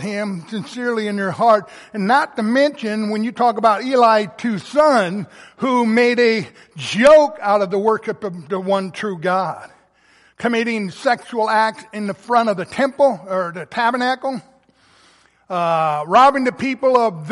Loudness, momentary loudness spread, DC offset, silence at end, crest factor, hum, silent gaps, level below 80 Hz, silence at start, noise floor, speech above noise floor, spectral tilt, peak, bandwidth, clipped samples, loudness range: -17 LUFS; 13 LU; under 0.1%; 0 s; 16 dB; none; none; -60 dBFS; 0 s; -54 dBFS; 37 dB; -5.5 dB/octave; -2 dBFS; 11.5 kHz; under 0.1%; 5 LU